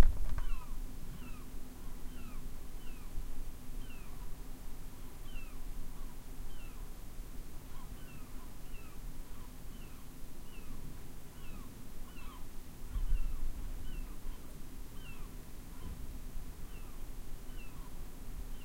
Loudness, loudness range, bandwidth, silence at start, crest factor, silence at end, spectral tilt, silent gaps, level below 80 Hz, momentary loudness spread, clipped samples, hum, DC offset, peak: -49 LUFS; 5 LU; 16 kHz; 0 s; 26 dB; 0 s; -5 dB/octave; none; -40 dBFS; 7 LU; under 0.1%; none; under 0.1%; -10 dBFS